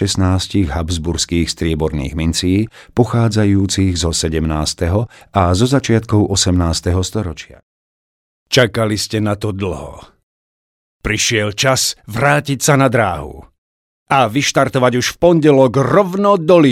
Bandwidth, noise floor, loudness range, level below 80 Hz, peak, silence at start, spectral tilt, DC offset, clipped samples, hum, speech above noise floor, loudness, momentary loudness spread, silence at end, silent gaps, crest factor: 16 kHz; under -90 dBFS; 5 LU; -32 dBFS; 0 dBFS; 0 s; -5 dB/octave; under 0.1%; under 0.1%; none; over 76 dB; -15 LUFS; 8 LU; 0 s; 7.63-8.46 s, 10.23-11.00 s, 13.58-14.06 s; 16 dB